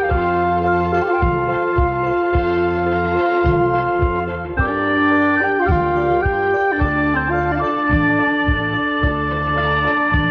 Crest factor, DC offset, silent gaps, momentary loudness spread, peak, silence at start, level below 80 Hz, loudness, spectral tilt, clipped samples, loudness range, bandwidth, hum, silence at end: 14 dB; under 0.1%; none; 3 LU; -4 dBFS; 0 s; -28 dBFS; -17 LUFS; -9 dB/octave; under 0.1%; 1 LU; 5.6 kHz; none; 0 s